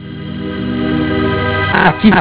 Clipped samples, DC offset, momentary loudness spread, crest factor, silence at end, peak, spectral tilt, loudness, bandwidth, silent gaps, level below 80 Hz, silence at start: 0.3%; under 0.1%; 13 LU; 14 dB; 0 s; 0 dBFS; -10 dB/octave; -14 LUFS; 4 kHz; none; -30 dBFS; 0 s